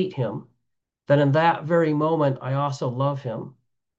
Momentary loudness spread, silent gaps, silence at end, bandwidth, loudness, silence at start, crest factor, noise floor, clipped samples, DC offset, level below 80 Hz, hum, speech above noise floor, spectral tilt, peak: 14 LU; none; 0.5 s; 7.8 kHz; -23 LUFS; 0 s; 18 dB; -79 dBFS; under 0.1%; under 0.1%; -70 dBFS; none; 56 dB; -8 dB/octave; -6 dBFS